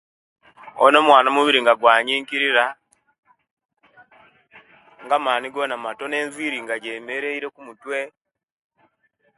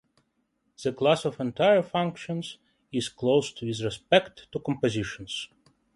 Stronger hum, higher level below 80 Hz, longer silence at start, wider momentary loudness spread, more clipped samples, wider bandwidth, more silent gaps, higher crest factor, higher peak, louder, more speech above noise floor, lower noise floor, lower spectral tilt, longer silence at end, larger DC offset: neither; second, -72 dBFS vs -60 dBFS; second, 0.65 s vs 0.8 s; about the same, 14 LU vs 12 LU; neither; about the same, 11.5 kHz vs 11.5 kHz; first, 3.19-3.23 s, 3.51-3.57 s vs none; about the same, 22 dB vs 20 dB; first, 0 dBFS vs -8 dBFS; first, -19 LUFS vs -27 LUFS; about the same, 47 dB vs 47 dB; second, -66 dBFS vs -74 dBFS; second, -2.5 dB/octave vs -5 dB/octave; first, 1.3 s vs 0.5 s; neither